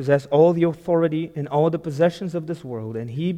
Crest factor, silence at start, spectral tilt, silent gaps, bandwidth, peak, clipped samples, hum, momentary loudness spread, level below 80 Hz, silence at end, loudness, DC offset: 18 dB; 0 s; -8.5 dB/octave; none; 10 kHz; -4 dBFS; under 0.1%; none; 13 LU; -60 dBFS; 0 s; -22 LUFS; under 0.1%